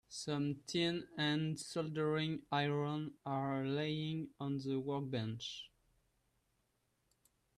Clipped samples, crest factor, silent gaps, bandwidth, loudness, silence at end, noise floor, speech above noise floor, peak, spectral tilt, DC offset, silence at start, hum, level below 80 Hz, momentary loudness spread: under 0.1%; 16 dB; none; 12.5 kHz; -39 LUFS; 1.9 s; -81 dBFS; 42 dB; -24 dBFS; -5.5 dB/octave; under 0.1%; 0.1 s; none; -74 dBFS; 6 LU